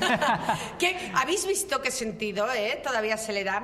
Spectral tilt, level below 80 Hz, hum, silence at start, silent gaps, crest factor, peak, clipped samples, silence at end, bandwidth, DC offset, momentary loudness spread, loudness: -2.5 dB/octave; -58 dBFS; none; 0 s; none; 18 dB; -10 dBFS; under 0.1%; 0 s; 15.5 kHz; under 0.1%; 5 LU; -27 LUFS